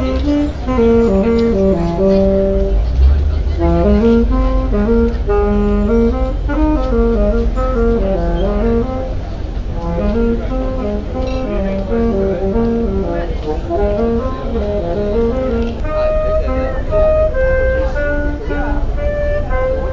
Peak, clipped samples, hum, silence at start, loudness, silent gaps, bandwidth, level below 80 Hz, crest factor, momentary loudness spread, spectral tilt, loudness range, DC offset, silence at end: -2 dBFS; under 0.1%; none; 0 s; -16 LUFS; none; 7.4 kHz; -18 dBFS; 12 dB; 8 LU; -9 dB/octave; 4 LU; under 0.1%; 0 s